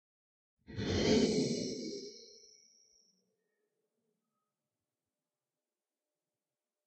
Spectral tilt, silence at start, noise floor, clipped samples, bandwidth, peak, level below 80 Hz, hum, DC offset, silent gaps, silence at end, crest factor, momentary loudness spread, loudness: -5 dB/octave; 0.7 s; under -90 dBFS; under 0.1%; 8.8 kHz; -18 dBFS; -60 dBFS; none; under 0.1%; none; 4.5 s; 22 dB; 21 LU; -34 LUFS